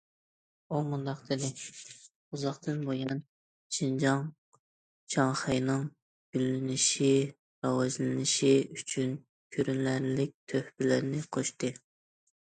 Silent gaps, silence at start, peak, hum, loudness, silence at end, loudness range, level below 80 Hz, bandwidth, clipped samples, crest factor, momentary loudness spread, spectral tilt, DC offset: 2.15-2.31 s, 3.29-3.70 s, 4.38-4.52 s, 4.59-5.07 s, 6.02-6.33 s, 7.39-7.62 s, 9.29-9.50 s, 10.34-10.47 s; 0.7 s; -12 dBFS; none; -31 LUFS; 0.85 s; 7 LU; -70 dBFS; 9.4 kHz; under 0.1%; 20 dB; 12 LU; -4.5 dB/octave; under 0.1%